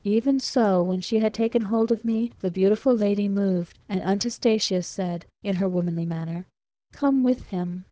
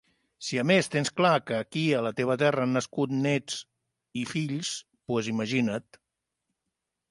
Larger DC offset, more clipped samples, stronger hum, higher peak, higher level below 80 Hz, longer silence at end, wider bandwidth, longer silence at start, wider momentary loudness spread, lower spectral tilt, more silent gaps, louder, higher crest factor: neither; neither; neither; about the same, -10 dBFS vs -10 dBFS; first, -58 dBFS vs -70 dBFS; second, 0.1 s vs 1.3 s; second, 8 kHz vs 11.5 kHz; second, 0.05 s vs 0.4 s; second, 8 LU vs 12 LU; about the same, -6 dB/octave vs -5 dB/octave; neither; first, -24 LUFS vs -28 LUFS; second, 14 dB vs 20 dB